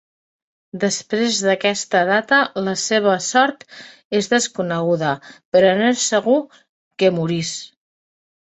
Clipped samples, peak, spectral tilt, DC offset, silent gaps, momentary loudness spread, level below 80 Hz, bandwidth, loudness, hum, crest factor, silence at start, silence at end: under 0.1%; -2 dBFS; -3.5 dB/octave; under 0.1%; 4.04-4.11 s, 5.45-5.52 s, 6.69-6.91 s; 9 LU; -64 dBFS; 8.4 kHz; -18 LUFS; none; 18 dB; 0.75 s; 0.9 s